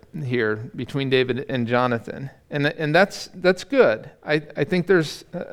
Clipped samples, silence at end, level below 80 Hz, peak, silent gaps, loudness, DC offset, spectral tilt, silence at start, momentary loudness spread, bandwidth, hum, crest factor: under 0.1%; 0 s; -56 dBFS; -4 dBFS; none; -22 LUFS; under 0.1%; -6 dB/octave; 0.15 s; 11 LU; 14 kHz; none; 18 dB